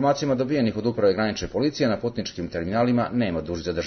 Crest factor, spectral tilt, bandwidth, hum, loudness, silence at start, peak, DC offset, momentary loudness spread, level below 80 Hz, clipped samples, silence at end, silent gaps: 14 dB; -6 dB/octave; 6.6 kHz; none; -24 LUFS; 0 s; -8 dBFS; under 0.1%; 7 LU; -50 dBFS; under 0.1%; 0 s; none